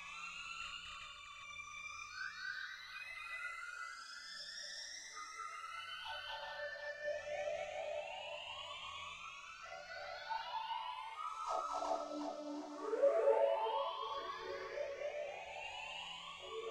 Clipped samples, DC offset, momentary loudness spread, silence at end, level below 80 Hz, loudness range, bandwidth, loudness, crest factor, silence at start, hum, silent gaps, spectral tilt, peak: under 0.1%; under 0.1%; 10 LU; 0 s; -76 dBFS; 8 LU; 12.5 kHz; -43 LUFS; 22 dB; 0 s; none; none; -1.5 dB/octave; -22 dBFS